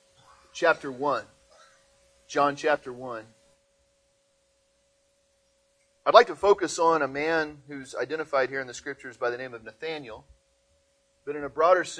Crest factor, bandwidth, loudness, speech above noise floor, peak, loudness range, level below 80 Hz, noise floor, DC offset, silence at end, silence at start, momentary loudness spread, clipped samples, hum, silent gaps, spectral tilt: 26 dB; 10.5 kHz; -26 LUFS; 43 dB; -2 dBFS; 11 LU; -66 dBFS; -69 dBFS; under 0.1%; 0 s; 0.55 s; 17 LU; under 0.1%; none; none; -3.5 dB/octave